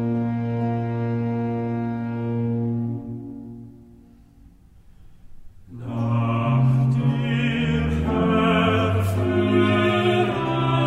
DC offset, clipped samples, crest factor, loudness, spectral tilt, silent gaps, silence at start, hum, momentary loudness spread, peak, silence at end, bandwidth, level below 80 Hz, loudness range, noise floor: under 0.1%; under 0.1%; 16 dB; -22 LUFS; -8 dB/octave; none; 0 s; none; 12 LU; -8 dBFS; 0 s; 12.5 kHz; -42 dBFS; 11 LU; -50 dBFS